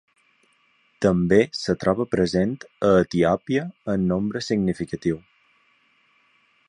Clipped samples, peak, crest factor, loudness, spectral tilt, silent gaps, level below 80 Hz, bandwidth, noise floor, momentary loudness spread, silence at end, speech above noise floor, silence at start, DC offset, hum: under 0.1%; -4 dBFS; 20 dB; -22 LUFS; -6.5 dB/octave; none; -50 dBFS; 10.5 kHz; -63 dBFS; 8 LU; 1.5 s; 42 dB; 1 s; under 0.1%; none